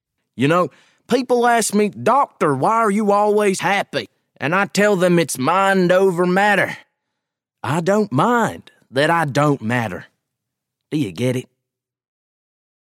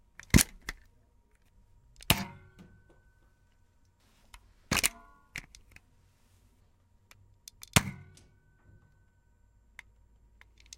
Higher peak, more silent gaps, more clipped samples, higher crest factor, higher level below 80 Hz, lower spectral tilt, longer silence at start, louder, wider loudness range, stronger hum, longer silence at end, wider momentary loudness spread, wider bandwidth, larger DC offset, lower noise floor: about the same, -2 dBFS vs -4 dBFS; neither; neither; second, 16 dB vs 32 dB; second, -66 dBFS vs -48 dBFS; first, -5 dB/octave vs -3 dB/octave; about the same, 0.35 s vs 0.35 s; first, -18 LUFS vs -30 LUFS; about the same, 5 LU vs 4 LU; neither; second, 1.55 s vs 2.85 s; second, 10 LU vs 29 LU; about the same, 16.5 kHz vs 16.5 kHz; neither; first, -81 dBFS vs -66 dBFS